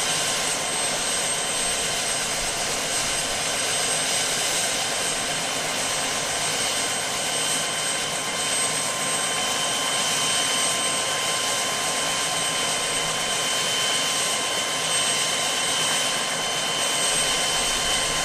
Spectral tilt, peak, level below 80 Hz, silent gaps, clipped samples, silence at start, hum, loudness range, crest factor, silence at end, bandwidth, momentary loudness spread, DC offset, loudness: 0 dB/octave; -10 dBFS; -50 dBFS; none; under 0.1%; 0 s; none; 1 LU; 14 dB; 0 s; 15.5 kHz; 3 LU; under 0.1%; -22 LUFS